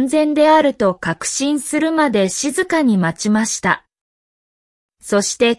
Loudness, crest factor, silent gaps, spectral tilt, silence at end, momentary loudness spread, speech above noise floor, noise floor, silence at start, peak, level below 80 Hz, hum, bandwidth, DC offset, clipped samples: -16 LUFS; 14 dB; 4.01-4.89 s; -4 dB/octave; 0.05 s; 7 LU; over 74 dB; under -90 dBFS; 0 s; -2 dBFS; -54 dBFS; none; 12 kHz; under 0.1%; under 0.1%